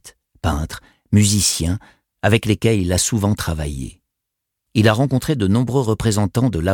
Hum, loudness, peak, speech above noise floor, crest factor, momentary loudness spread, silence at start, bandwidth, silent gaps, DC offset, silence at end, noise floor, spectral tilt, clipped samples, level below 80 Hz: none; -18 LUFS; -2 dBFS; 63 dB; 16 dB; 11 LU; 0.05 s; 18.5 kHz; none; under 0.1%; 0 s; -80 dBFS; -5 dB/octave; under 0.1%; -36 dBFS